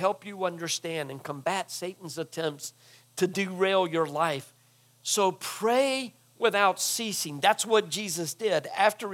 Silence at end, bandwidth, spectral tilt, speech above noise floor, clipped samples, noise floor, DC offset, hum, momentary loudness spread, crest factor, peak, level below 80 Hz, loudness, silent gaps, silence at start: 0 s; 17.5 kHz; -3 dB/octave; 34 dB; under 0.1%; -61 dBFS; under 0.1%; none; 12 LU; 20 dB; -8 dBFS; -88 dBFS; -28 LUFS; none; 0 s